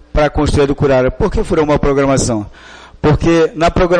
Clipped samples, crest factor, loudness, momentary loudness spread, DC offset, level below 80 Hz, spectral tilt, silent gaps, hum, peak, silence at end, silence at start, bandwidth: under 0.1%; 10 dB; -13 LUFS; 6 LU; under 0.1%; -24 dBFS; -6 dB/octave; none; none; -4 dBFS; 0 s; 0.15 s; 10 kHz